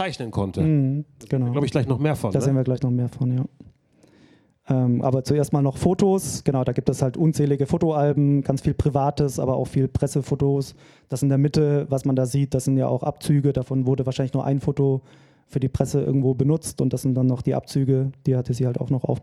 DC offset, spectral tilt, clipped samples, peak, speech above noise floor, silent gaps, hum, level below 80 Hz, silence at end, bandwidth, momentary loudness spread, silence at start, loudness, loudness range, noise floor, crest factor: under 0.1%; -7.5 dB/octave; under 0.1%; -2 dBFS; 35 dB; none; none; -46 dBFS; 0 s; 13 kHz; 5 LU; 0 s; -22 LUFS; 3 LU; -56 dBFS; 20 dB